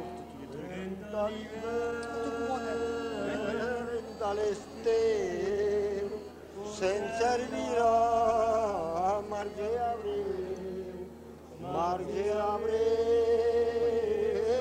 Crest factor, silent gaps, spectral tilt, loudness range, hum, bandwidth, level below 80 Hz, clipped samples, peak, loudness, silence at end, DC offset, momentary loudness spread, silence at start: 16 dB; none; -5 dB/octave; 5 LU; none; 10 kHz; -56 dBFS; under 0.1%; -16 dBFS; -31 LUFS; 0 s; under 0.1%; 14 LU; 0 s